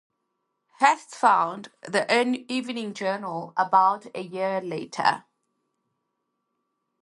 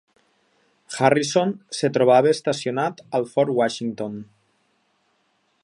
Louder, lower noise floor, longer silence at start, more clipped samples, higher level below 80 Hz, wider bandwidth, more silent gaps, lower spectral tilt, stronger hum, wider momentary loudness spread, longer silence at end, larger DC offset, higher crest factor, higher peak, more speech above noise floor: second, -24 LUFS vs -21 LUFS; first, -79 dBFS vs -67 dBFS; about the same, 0.8 s vs 0.9 s; neither; second, -80 dBFS vs -70 dBFS; about the same, 11.5 kHz vs 11.5 kHz; neither; about the same, -4 dB/octave vs -5 dB/octave; neither; about the same, 12 LU vs 14 LU; first, 1.8 s vs 1.4 s; neither; about the same, 22 dB vs 22 dB; about the same, -4 dBFS vs -2 dBFS; first, 54 dB vs 47 dB